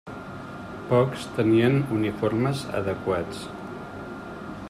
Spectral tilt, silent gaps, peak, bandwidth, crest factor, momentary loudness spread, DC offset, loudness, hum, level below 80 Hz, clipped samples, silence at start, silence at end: -7 dB/octave; none; -8 dBFS; 14 kHz; 18 dB; 17 LU; under 0.1%; -25 LUFS; none; -54 dBFS; under 0.1%; 0.05 s; 0 s